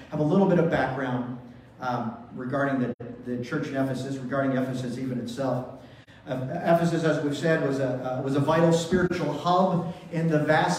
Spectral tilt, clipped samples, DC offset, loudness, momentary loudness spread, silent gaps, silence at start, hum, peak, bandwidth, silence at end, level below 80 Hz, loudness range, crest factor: -6.5 dB/octave; under 0.1%; under 0.1%; -26 LUFS; 12 LU; 2.94-2.99 s; 0 s; none; -8 dBFS; 14 kHz; 0 s; -58 dBFS; 6 LU; 18 dB